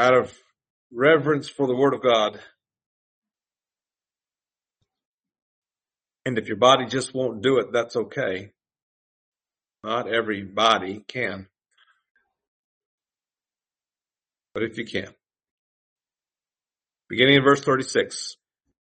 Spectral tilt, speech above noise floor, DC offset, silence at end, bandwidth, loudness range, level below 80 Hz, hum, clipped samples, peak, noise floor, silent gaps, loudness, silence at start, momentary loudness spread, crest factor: -4.5 dB/octave; over 68 dB; under 0.1%; 0.5 s; 8.8 kHz; 13 LU; -66 dBFS; none; under 0.1%; -2 dBFS; under -90 dBFS; 0.70-0.90 s, 2.86-3.22 s, 5.05-5.18 s, 5.42-5.62 s, 8.82-9.32 s, 12.11-12.15 s, 12.48-12.98 s, 15.51-15.96 s; -22 LUFS; 0 s; 16 LU; 24 dB